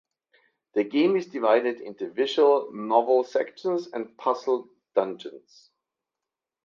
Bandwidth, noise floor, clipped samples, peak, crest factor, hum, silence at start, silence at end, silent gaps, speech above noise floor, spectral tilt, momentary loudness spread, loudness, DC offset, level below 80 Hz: 7.2 kHz; -88 dBFS; under 0.1%; -6 dBFS; 20 dB; none; 0.75 s; 1.25 s; none; 64 dB; -5.5 dB/octave; 12 LU; -25 LUFS; under 0.1%; -80 dBFS